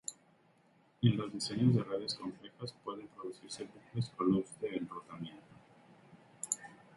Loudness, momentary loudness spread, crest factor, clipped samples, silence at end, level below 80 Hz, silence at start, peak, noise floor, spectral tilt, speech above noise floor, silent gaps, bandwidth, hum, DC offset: -37 LUFS; 16 LU; 24 dB; under 0.1%; 0.2 s; -70 dBFS; 0.1 s; -14 dBFS; -69 dBFS; -5.5 dB/octave; 33 dB; none; 11.5 kHz; none; under 0.1%